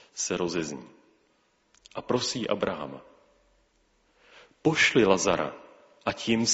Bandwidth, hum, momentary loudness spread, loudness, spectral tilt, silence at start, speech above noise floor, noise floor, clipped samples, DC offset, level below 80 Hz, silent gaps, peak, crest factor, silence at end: 8 kHz; none; 20 LU; -27 LUFS; -3 dB/octave; 0.15 s; 42 dB; -68 dBFS; under 0.1%; under 0.1%; -62 dBFS; none; -6 dBFS; 22 dB; 0 s